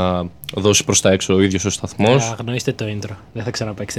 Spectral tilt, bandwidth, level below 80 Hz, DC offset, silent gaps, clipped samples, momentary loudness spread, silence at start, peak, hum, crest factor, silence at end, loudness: -4 dB/octave; 15.5 kHz; -46 dBFS; under 0.1%; none; under 0.1%; 12 LU; 0 s; -2 dBFS; none; 16 dB; 0 s; -18 LUFS